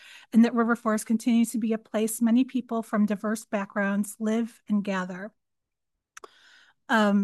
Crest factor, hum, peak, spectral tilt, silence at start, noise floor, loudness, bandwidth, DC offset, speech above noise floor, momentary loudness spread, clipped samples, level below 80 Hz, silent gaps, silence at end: 16 dB; none; -10 dBFS; -5.5 dB/octave; 0.1 s; -85 dBFS; -26 LUFS; 12.5 kHz; under 0.1%; 60 dB; 8 LU; under 0.1%; -76 dBFS; none; 0 s